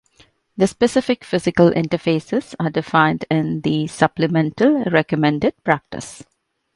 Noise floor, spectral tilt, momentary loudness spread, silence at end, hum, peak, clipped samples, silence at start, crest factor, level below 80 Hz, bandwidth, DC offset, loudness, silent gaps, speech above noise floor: -55 dBFS; -6.5 dB/octave; 7 LU; 0.6 s; none; 0 dBFS; under 0.1%; 0.55 s; 18 dB; -52 dBFS; 11.5 kHz; under 0.1%; -18 LUFS; none; 37 dB